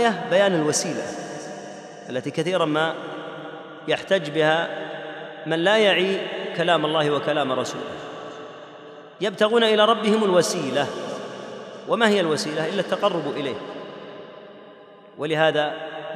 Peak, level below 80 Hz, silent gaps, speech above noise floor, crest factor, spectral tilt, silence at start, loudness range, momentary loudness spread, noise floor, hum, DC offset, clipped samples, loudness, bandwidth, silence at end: -4 dBFS; -74 dBFS; none; 24 dB; 20 dB; -4 dB/octave; 0 s; 5 LU; 19 LU; -46 dBFS; none; under 0.1%; under 0.1%; -22 LUFS; 14 kHz; 0 s